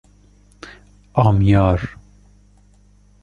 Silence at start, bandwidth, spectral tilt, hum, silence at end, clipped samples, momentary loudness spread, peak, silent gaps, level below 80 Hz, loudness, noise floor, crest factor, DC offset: 0.65 s; 6.8 kHz; -9 dB/octave; 50 Hz at -30 dBFS; 1.3 s; under 0.1%; 26 LU; -2 dBFS; none; -34 dBFS; -17 LUFS; -51 dBFS; 18 dB; under 0.1%